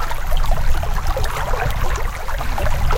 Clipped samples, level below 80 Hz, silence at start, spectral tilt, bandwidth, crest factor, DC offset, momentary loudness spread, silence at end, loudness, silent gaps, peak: under 0.1%; -18 dBFS; 0 s; -4.5 dB/octave; 16.5 kHz; 12 dB; under 0.1%; 3 LU; 0 s; -23 LUFS; none; -4 dBFS